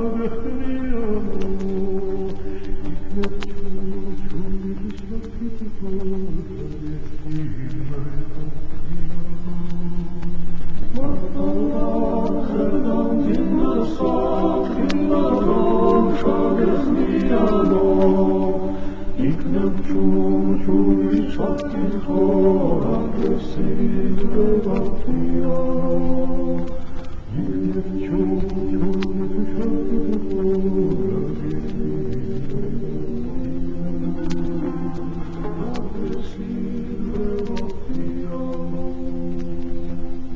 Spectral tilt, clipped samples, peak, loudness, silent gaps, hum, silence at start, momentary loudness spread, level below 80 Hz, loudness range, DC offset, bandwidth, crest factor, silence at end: -9 dB/octave; under 0.1%; -2 dBFS; -23 LUFS; none; none; 0 s; 13 LU; -32 dBFS; 11 LU; under 0.1%; 6.6 kHz; 14 dB; 0 s